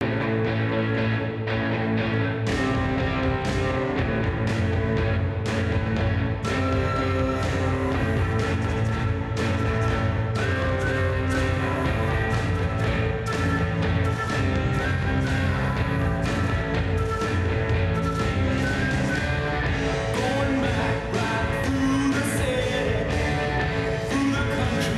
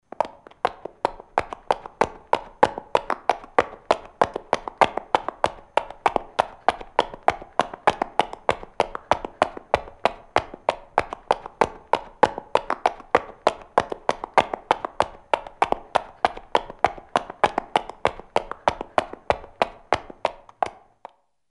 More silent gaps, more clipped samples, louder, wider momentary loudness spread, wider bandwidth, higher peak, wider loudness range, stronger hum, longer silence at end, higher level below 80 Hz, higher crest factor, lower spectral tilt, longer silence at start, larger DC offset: neither; neither; about the same, -24 LUFS vs -25 LUFS; second, 1 LU vs 6 LU; about the same, 12.5 kHz vs 11.5 kHz; second, -12 dBFS vs 0 dBFS; about the same, 1 LU vs 2 LU; neither; second, 0 s vs 0.8 s; first, -34 dBFS vs -50 dBFS; second, 12 dB vs 24 dB; first, -6.5 dB/octave vs -4 dB/octave; second, 0 s vs 0.2 s; neither